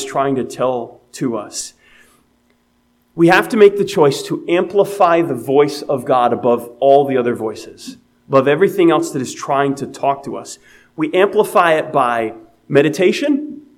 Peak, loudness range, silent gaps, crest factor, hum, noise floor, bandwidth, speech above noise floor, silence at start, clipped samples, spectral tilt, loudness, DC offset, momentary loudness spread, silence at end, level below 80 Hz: 0 dBFS; 3 LU; none; 16 dB; none; -59 dBFS; 16 kHz; 44 dB; 0 s; under 0.1%; -5.5 dB/octave; -15 LUFS; under 0.1%; 14 LU; 0.15 s; -62 dBFS